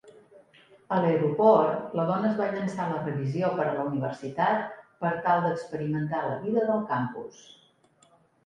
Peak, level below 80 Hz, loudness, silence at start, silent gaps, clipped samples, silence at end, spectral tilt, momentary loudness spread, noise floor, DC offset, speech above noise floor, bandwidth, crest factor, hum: -8 dBFS; -70 dBFS; -27 LUFS; 0.05 s; none; under 0.1%; 1.15 s; -8 dB/octave; 9 LU; -62 dBFS; under 0.1%; 36 dB; 10.5 kHz; 20 dB; none